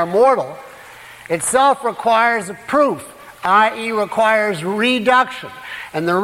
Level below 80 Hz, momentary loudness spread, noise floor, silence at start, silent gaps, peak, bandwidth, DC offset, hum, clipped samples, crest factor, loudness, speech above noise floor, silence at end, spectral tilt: -58 dBFS; 16 LU; -39 dBFS; 0 s; none; -2 dBFS; 16.5 kHz; under 0.1%; none; under 0.1%; 14 dB; -16 LUFS; 22 dB; 0 s; -3.5 dB/octave